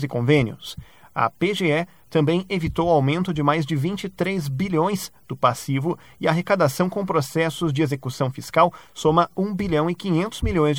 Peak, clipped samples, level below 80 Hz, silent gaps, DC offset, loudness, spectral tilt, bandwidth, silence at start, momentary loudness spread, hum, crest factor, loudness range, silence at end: -4 dBFS; under 0.1%; -44 dBFS; none; 0.2%; -22 LUFS; -6.5 dB/octave; 18 kHz; 0 s; 7 LU; none; 18 dB; 1 LU; 0 s